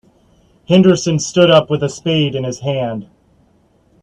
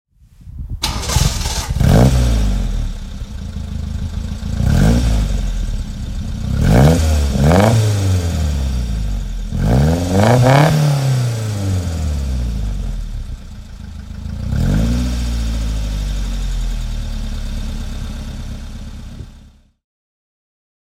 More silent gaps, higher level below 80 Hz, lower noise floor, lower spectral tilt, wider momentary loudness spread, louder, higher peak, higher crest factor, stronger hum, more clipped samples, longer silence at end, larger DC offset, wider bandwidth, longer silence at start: neither; second, -52 dBFS vs -20 dBFS; first, -54 dBFS vs -43 dBFS; about the same, -5.5 dB/octave vs -6 dB/octave; second, 10 LU vs 18 LU; first, -14 LUFS vs -17 LUFS; about the same, 0 dBFS vs 0 dBFS; about the same, 16 dB vs 16 dB; neither; neither; second, 1 s vs 1.45 s; neither; second, 9.4 kHz vs 16 kHz; first, 0.7 s vs 0.4 s